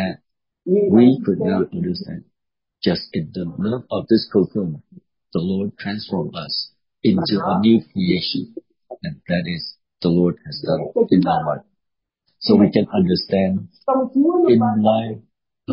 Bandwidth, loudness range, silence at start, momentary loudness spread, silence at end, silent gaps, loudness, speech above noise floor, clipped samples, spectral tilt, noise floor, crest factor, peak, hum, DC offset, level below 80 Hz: 5.6 kHz; 5 LU; 0 s; 16 LU; 0 s; none; -19 LUFS; 62 dB; under 0.1%; -11 dB/octave; -80 dBFS; 18 dB; -2 dBFS; none; under 0.1%; -50 dBFS